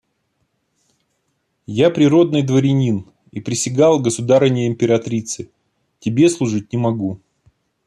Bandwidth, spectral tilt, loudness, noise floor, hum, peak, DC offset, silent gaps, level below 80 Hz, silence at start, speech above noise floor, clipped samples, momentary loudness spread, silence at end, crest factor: 12.5 kHz; -6 dB/octave; -17 LUFS; -69 dBFS; none; -2 dBFS; under 0.1%; none; -58 dBFS; 1.7 s; 53 dB; under 0.1%; 14 LU; 0.7 s; 16 dB